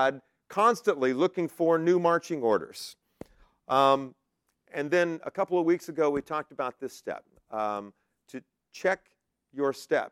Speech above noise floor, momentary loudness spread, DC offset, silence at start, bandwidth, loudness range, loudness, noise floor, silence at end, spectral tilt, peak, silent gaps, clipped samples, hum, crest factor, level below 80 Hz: 46 dB; 18 LU; under 0.1%; 0 s; 15 kHz; 7 LU; -28 LUFS; -73 dBFS; 0.05 s; -5.5 dB/octave; -8 dBFS; none; under 0.1%; none; 20 dB; -70 dBFS